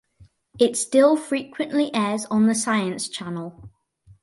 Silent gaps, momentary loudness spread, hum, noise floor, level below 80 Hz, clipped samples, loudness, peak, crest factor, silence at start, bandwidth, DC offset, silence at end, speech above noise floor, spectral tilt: none; 13 LU; none; -55 dBFS; -62 dBFS; under 0.1%; -22 LUFS; -6 dBFS; 18 dB; 0.2 s; 11.5 kHz; under 0.1%; 0.55 s; 33 dB; -4 dB/octave